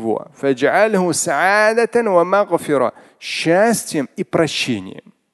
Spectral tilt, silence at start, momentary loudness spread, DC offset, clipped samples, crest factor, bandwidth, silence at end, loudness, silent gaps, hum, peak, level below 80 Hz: -4 dB/octave; 0 s; 9 LU; under 0.1%; under 0.1%; 16 dB; 12.5 kHz; 0.35 s; -16 LUFS; none; none; 0 dBFS; -60 dBFS